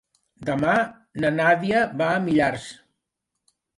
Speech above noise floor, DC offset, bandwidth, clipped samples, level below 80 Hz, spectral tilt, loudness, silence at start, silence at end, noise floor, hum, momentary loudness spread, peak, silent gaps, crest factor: 60 dB; under 0.1%; 11.5 kHz; under 0.1%; -58 dBFS; -6 dB/octave; -22 LUFS; 0.4 s; 1.05 s; -81 dBFS; none; 12 LU; -6 dBFS; none; 18 dB